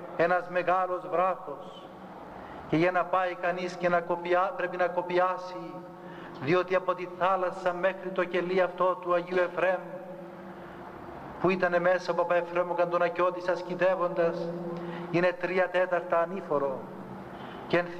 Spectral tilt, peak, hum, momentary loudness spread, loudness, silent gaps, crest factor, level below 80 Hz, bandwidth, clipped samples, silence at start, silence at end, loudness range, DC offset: -6.5 dB/octave; -12 dBFS; none; 17 LU; -28 LUFS; none; 16 dB; -66 dBFS; 8.6 kHz; under 0.1%; 0 s; 0 s; 2 LU; under 0.1%